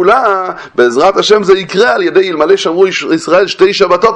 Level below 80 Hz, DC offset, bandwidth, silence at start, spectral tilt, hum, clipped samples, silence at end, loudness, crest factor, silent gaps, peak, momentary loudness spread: -48 dBFS; under 0.1%; 9 kHz; 0 s; -4 dB/octave; none; 0.7%; 0 s; -9 LUFS; 8 dB; none; 0 dBFS; 4 LU